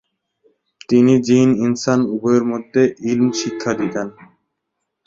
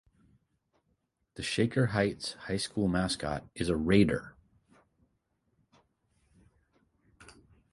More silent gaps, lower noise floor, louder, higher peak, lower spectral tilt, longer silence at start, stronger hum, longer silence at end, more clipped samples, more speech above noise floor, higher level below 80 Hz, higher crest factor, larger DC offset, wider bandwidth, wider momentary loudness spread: neither; about the same, -76 dBFS vs -77 dBFS; first, -17 LUFS vs -30 LUFS; first, -2 dBFS vs -12 dBFS; about the same, -6 dB/octave vs -5.5 dB/octave; second, 0.9 s vs 1.35 s; neither; first, 0.95 s vs 0.5 s; neither; first, 60 dB vs 48 dB; about the same, -58 dBFS vs -54 dBFS; second, 16 dB vs 22 dB; neither; second, 7.8 kHz vs 11.5 kHz; about the same, 9 LU vs 11 LU